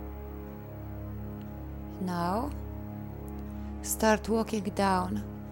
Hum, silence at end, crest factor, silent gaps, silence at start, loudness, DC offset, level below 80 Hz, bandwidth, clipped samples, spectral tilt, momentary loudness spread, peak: none; 0 s; 22 dB; none; 0 s; -33 LUFS; under 0.1%; -44 dBFS; 17 kHz; under 0.1%; -5 dB/octave; 15 LU; -12 dBFS